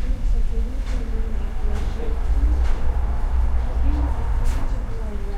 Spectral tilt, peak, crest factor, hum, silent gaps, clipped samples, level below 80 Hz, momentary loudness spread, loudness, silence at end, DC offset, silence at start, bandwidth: -7.5 dB/octave; -6 dBFS; 12 dB; none; none; under 0.1%; -20 dBFS; 6 LU; -26 LUFS; 0 s; 0.5%; 0 s; 8 kHz